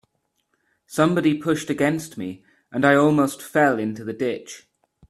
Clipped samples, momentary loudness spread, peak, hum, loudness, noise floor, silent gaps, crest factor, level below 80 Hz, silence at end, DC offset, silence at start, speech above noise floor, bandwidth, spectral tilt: under 0.1%; 16 LU; -2 dBFS; none; -21 LUFS; -72 dBFS; none; 20 dB; -62 dBFS; 0.5 s; under 0.1%; 0.9 s; 51 dB; 14 kHz; -6 dB/octave